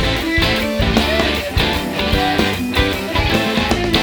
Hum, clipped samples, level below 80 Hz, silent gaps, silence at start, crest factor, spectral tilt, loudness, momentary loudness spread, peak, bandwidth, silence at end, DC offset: none; under 0.1%; -26 dBFS; none; 0 s; 16 dB; -4.5 dB/octave; -16 LUFS; 2 LU; 0 dBFS; over 20 kHz; 0 s; under 0.1%